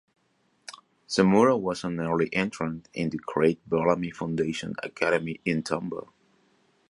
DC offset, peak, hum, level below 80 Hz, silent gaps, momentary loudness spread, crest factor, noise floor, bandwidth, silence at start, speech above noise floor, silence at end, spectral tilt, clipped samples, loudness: under 0.1%; -8 dBFS; none; -60 dBFS; none; 14 LU; 20 dB; -69 dBFS; 11.5 kHz; 0.7 s; 43 dB; 0.9 s; -6 dB/octave; under 0.1%; -26 LUFS